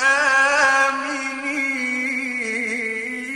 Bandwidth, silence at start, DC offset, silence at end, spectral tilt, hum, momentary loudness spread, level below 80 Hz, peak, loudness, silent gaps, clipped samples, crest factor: 12.5 kHz; 0 s; under 0.1%; 0 s; -1 dB/octave; none; 9 LU; -60 dBFS; -4 dBFS; -19 LUFS; none; under 0.1%; 18 dB